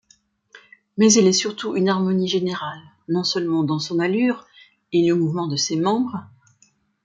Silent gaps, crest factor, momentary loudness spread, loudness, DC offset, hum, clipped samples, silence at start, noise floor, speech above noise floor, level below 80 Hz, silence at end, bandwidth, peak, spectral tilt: none; 18 dB; 13 LU; -20 LUFS; under 0.1%; none; under 0.1%; 0.55 s; -61 dBFS; 41 dB; -66 dBFS; 0.8 s; 9.4 kHz; -2 dBFS; -4.5 dB/octave